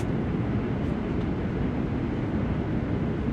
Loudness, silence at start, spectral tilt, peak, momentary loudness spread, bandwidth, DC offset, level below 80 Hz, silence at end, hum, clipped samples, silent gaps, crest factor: -28 LUFS; 0 s; -9.5 dB/octave; -14 dBFS; 1 LU; 8 kHz; under 0.1%; -38 dBFS; 0 s; none; under 0.1%; none; 12 dB